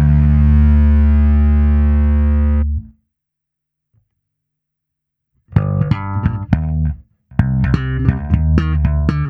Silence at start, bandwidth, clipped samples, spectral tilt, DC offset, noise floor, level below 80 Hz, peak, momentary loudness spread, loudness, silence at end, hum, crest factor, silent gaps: 0 s; 4.5 kHz; under 0.1%; -10.5 dB/octave; under 0.1%; -79 dBFS; -16 dBFS; 0 dBFS; 8 LU; -15 LUFS; 0 s; none; 14 dB; none